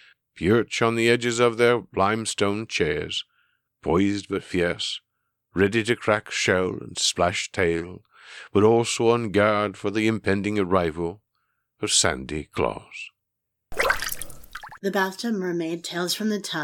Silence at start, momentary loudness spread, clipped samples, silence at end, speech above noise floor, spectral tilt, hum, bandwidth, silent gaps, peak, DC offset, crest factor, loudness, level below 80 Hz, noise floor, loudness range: 0.35 s; 13 LU; under 0.1%; 0 s; 57 dB; -4 dB/octave; none; 19 kHz; none; -4 dBFS; under 0.1%; 20 dB; -23 LUFS; -50 dBFS; -81 dBFS; 4 LU